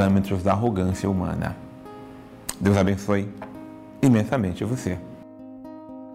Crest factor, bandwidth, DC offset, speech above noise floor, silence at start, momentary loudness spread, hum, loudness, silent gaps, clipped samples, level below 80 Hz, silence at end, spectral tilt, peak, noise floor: 16 dB; 16 kHz; under 0.1%; 20 dB; 0 s; 21 LU; none; -24 LUFS; none; under 0.1%; -52 dBFS; 0 s; -7 dB/octave; -8 dBFS; -42 dBFS